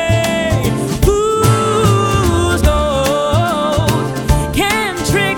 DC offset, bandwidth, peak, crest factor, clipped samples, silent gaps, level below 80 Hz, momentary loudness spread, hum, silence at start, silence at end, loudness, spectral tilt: under 0.1%; 19 kHz; 0 dBFS; 14 dB; under 0.1%; none; -22 dBFS; 3 LU; none; 0 s; 0 s; -14 LUFS; -5 dB/octave